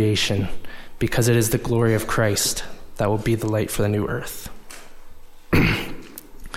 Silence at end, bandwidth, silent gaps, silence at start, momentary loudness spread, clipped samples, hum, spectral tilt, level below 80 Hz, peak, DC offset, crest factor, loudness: 0 s; 16.5 kHz; none; 0 s; 21 LU; under 0.1%; none; -4.5 dB/octave; -36 dBFS; -4 dBFS; under 0.1%; 18 dB; -22 LUFS